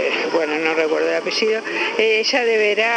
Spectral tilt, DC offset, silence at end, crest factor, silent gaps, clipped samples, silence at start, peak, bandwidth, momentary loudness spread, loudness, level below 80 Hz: -2 dB/octave; under 0.1%; 0 s; 16 dB; none; under 0.1%; 0 s; -2 dBFS; 9.4 kHz; 4 LU; -18 LUFS; -76 dBFS